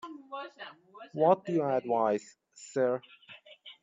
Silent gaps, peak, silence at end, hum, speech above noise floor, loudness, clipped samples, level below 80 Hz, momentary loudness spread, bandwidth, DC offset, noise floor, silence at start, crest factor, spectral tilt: none; -12 dBFS; 0.1 s; none; 24 dB; -30 LUFS; under 0.1%; -82 dBFS; 24 LU; 7.8 kHz; under 0.1%; -54 dBFS; 0.05 s; 20 dB; -6 dB/octave